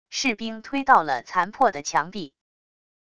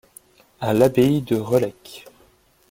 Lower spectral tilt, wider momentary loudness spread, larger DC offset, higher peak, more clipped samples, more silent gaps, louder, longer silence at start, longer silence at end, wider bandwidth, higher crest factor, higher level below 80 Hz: second, -3 dB/octave vs -7 dB/octave; second, 14 LU vs 24 LU; first, 0.3% vs under 0.1%; about the same, -2 dBFS vs -2 dBFS; neither; neither; second, -23 LUFS vs -20 LUFS; second, 0.1 s vs 0.6 s; about the same, 0.8 s vs 0.7 s; second, 11 kHz vs 17 kHz; about the same, 22 dB vs 20 dB; second, -60 dBFS vs -54 dBFS